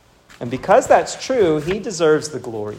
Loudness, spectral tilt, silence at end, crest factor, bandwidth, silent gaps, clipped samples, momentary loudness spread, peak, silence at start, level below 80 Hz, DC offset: -17 LUFS; -4.5 dB/octave; 0 s; 18 dB; 15.5 kHz; none; under 0.1%; 14 LU; 0 dBFS; 0.4 s; -50 dBFS; under 0.1%